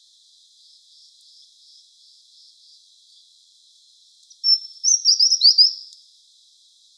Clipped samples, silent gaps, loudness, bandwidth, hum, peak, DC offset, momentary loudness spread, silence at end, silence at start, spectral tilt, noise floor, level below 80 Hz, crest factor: under 0.1%; none; -14 LUFS; 11 kHz; none; -2 dBFS; under 0.1%; 8 LU; 1.15 s; 4.45 s; 11 dB/octave; -55 dBFS; under -90 dBFS; 22 dB